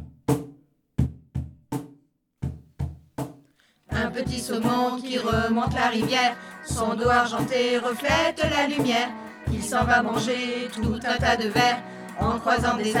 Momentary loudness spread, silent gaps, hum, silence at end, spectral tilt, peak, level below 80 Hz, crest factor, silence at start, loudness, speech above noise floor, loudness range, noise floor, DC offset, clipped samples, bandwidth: 14 LU; none; none; 0 s; -4.5 dB/octave; -8 dBFS; -44 dBFS; 18 dB; 0 s; -24 LUFS; 37 dB; 10 LU; -60 dBFS; under 0.1%; under 0.1%; 18.5 kHz